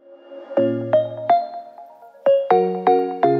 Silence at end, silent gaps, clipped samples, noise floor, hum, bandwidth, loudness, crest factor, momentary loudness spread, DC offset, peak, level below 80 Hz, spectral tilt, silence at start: 0 s; none; under 0.1%; -43 dBFS; none; 5.2 kHz; -19 LUFS; 16 dB; 12 LU; under 0.1%; -4 dBFS; -74 dBFS; -9 dB/octave; 0.1 s